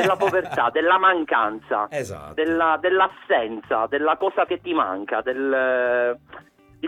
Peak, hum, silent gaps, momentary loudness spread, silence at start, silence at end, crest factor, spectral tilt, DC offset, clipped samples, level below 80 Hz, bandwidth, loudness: -6 dBFS; none; none; 8 LU; 0 s; 0 s; 16 dB; -5 dB/octave; under 0.1%; under 0.1%; -60 dBFS; 14.5 kHz; -21 LUFS